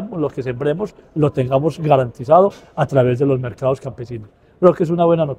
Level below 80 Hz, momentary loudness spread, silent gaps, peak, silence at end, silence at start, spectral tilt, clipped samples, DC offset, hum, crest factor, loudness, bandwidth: -50 dBFS; 11 LU; none; 0 dBFS; 0.05 s; 0 s; -8.5 dB/octave; under 0.1%; under 0.1%; none; 18 dB; -17 LUFS; 9.8 kHz